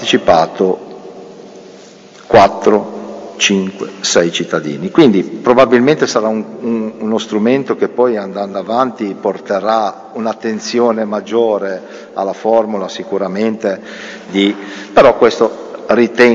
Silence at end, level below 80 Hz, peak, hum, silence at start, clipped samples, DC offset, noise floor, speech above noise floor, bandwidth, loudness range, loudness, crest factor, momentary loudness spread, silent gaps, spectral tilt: 0 s; -50 dBFS; 0 dBFS; none; 0 s; 0.3%; under 0.1%; -38 dBFS; 25 dB; 8 kHz; 4 LU; -14 LUFS; 14 dB; 14 LU; none; -4.5 dB/octave